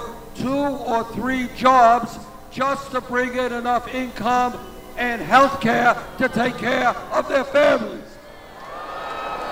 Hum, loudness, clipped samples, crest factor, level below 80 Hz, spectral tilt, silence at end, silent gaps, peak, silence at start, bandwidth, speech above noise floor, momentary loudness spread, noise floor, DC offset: none; -20 LUFS; under 0.1%; 20 dB; -46 dBFS; -4.5 dB/octave; 0 s; none; -2 dBFS; 0 s; 16 kHz; 21 dB; 17 LU; -40 dBFS; under 0.1%